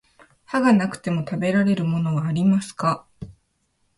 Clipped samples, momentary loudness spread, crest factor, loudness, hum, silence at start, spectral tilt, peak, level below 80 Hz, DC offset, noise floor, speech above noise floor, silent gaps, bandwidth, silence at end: under 0.1%; 12 LU; 16 dB; -22 LUFS; none; 0.5 s; -7 dB/octave; -6 dBFS; -56 dBFS; under 0.1%; -69 dBFS; 48 dB; none; 11.5 kHz; 0.65 s